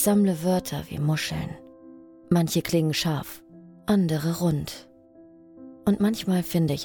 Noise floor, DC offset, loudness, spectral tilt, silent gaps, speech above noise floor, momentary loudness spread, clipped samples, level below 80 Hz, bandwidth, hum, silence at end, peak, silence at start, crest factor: -51 dBFS; under 0.1%; -25 LUFS; -5.5 dB/octave; none; 28 dB; 14 LU; under 0.1%; -54 dBFS; over 20 kHz; none; 0 s; -8 dBFS; 0 s; 18 dB